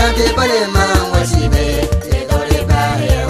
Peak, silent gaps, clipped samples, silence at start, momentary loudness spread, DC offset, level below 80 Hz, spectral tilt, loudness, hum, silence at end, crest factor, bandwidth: 0 dBFS; none; under 0.1%; 0 s; 4 LU; under 0.1%; -18 dBFS; -5 dB/octave; -14 LUFS; none; 0 s; 12 dB; 14.5 kHz